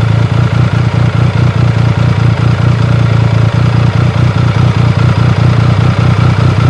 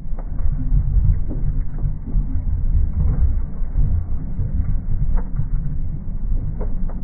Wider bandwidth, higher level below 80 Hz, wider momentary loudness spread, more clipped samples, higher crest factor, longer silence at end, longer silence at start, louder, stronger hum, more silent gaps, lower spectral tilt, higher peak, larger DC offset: first, 8.2 kHz vs 2 kHz; second, -26 dBFS vs -20 dBFS; second, 1 LU vs 7 LU; first, 0.3% vs under 0.1%; about the same, 8 dB vs 12 dB; about the same, 0 s vs 0 s; about the same, 0 s vs 0 s; first, -9 LUFS vs -24 LUFS; neither; neither; second, -7.5 dB/octave vs -15.5 dB/octave; first, 0 dBFS vs -6 dBFS; first, 0.1% vs under 0.1%